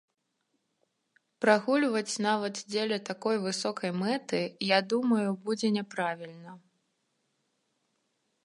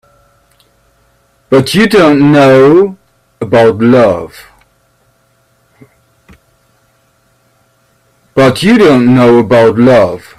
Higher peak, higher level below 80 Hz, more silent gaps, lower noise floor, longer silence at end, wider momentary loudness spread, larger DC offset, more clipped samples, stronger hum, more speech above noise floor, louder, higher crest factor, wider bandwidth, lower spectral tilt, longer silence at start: second, -8 dBFS vs 0 dBFS; second, -82 dBFS vs -44 dBFS; neither; first, -79 dBFS vs -53 dBFS; first, 1.85 s vs 0.2 s; about the same, 7 LU vs 8 LU; neither; neither; neither; about the same, 50 dB vs 47 dB; second, -29 LUFS vs -7 LUFS; first, 24 dB vs 10 dB; second, 11.5 kHz vs 14.5 kHz; second, -4.5 dB/octave vs -6.5 dB/octave; about the same, 1.4 s vs 1.5 s